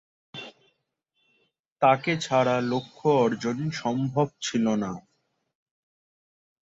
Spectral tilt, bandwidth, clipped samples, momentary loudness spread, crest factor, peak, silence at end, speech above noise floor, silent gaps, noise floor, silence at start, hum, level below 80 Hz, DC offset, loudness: -5.5 dB/octave; 8 kHz; under 0.1%; 19 LU; 20 dB; -8 dBFS; 1.65 s; 52 dB; 1.60-1.64 s, 1.72-1.76 s; -76 dBFS; 0.35 s; none; -68 dBFS; under 0.1%; -25 LUFS